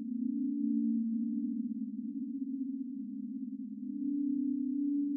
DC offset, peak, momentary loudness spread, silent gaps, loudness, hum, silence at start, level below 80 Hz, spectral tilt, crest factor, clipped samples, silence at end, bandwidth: under 0.1%; -24 dBFS; 8 LU; none; -36 LUFS; none; 0 s; under -90 dBFS; -7 dB/octave; 12 dB; under 0.1%; 0 s; 0.4 kHz